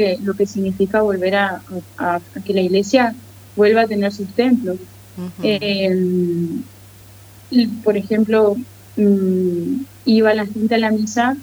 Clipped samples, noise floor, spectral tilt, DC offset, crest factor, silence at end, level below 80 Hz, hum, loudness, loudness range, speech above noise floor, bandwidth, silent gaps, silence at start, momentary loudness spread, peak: under 0.1%; -42 dBFS; -6 dB/octave; under 0.1%; 16 dB; 0 s; -56 dBFS; none; -18 LUFS; 3 LU; 25 dB; over 20 kHz; none; 0 s; 13 LU; -2 dBFS